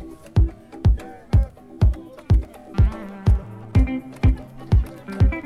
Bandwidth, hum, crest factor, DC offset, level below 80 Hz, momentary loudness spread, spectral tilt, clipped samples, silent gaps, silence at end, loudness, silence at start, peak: 6 kHz; none; 14 dB; under 0.1%; -22 dBFS; 6 LU; -9 dB/octave; under 0.1%; none; 0.05 s; -23 LUFS; 0 s; -6 dBFS